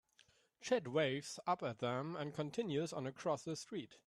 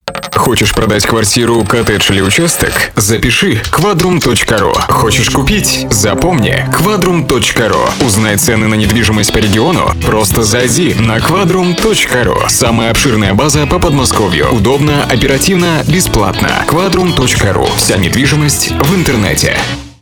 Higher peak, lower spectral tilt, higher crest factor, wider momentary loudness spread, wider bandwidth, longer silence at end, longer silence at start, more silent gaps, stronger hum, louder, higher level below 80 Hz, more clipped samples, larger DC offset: second, -24 dBFS vs 0 dBFS; about the same, -5 dB/octave vs -4 dB/octave; first, 18 dB vs 10 dB; first, 7 LU vs 2 LU; second, 13.5 kHz vs over 20 kHz; about the same, 0.1 s vs 0.1 s; first, 0.6 s vs 0.05 s; neither; neither; second, -41 LUFS vs -9 LUFS; second, -80 dBFS vs -24 dBFS; neither; neither